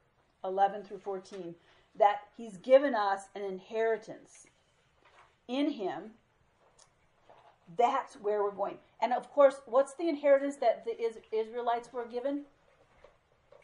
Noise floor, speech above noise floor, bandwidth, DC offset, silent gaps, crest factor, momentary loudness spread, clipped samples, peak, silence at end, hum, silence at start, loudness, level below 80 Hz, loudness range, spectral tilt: -69 dBFS; 38 dB; 11 kHz; under 0.1%; none; 22 dB; 17 LU; under 0.1%; -12 dBFS; 1.2 s; none; 0.45 s; -31 LUFS; -78 dBFS; 8 LU; -5 dB/octave